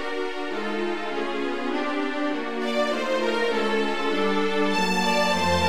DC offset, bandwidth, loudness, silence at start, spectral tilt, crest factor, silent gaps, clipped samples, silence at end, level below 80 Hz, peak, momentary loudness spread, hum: 2%; 17 kHz; -25 LUFS; 0 s; -4.5 dB/octave; 14 dB; none; under 0.1%; 0 s; -54 dBFS; -10 dBFS; 7 LU; none